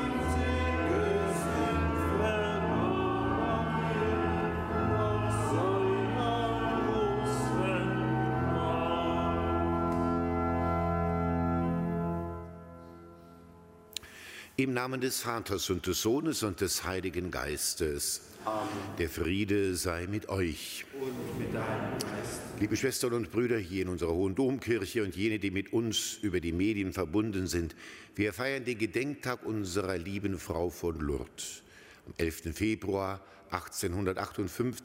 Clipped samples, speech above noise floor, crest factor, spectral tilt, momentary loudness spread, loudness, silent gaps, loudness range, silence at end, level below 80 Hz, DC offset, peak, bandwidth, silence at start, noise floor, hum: under 0.1%; 21 dB; 18 dB; -5 dB/octave; 8 LU; -32 LUFS; none; 5 LU; 0 s; -46 dBFS; under 0.1%; -12 dBFS; 16 kHz; 0 s; -54 dBFS; none